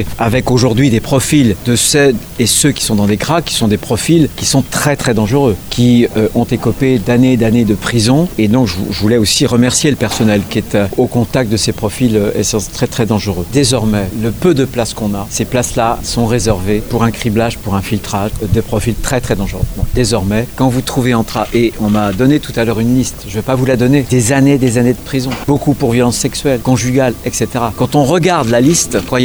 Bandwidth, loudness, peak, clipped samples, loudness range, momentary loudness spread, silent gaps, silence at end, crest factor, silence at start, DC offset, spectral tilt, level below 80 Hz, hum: over 20 kHz; -12 LUFS; 0 dBFS; under 0.1%; 3 LU; 6 LU; none; 0 s; 12 dB; 0 s; under 0.1%; -5 dB/octave; -28 dBFS; none